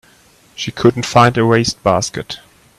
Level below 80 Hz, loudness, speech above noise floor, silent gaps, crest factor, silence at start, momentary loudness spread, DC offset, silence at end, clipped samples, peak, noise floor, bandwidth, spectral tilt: -46 dBFS; -14 LUFS; 35 dB; none; 16 dB; 0.6 s; 15 LU; under 0.1%; 0.4 s; under 0.1%; 0 dBFS; -49 dBFS; 13.5 kHz; -5 dB/octave